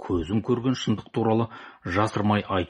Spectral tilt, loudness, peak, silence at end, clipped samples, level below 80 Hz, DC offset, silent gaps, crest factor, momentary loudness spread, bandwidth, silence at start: -6.5 dB/octave; -25 LUFS; -8 dBFS; 0.05 s; under 0.1%; -50 dBFS; under 0.1%; none; 18 dB; 5 LU; 11 kHz; 0 s